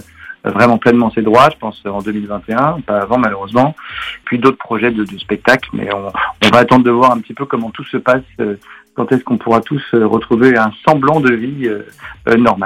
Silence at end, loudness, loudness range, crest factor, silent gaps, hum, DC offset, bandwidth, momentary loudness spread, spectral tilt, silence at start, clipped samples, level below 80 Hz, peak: 0 s; -13 LUFS; 3 LU; 14 dB; none; none; under 0.1%; 14 kHz; 12 LU; -6.5 dB/octave; 0.2 s; under 0.1%; -46 dBFS; 0 dBFS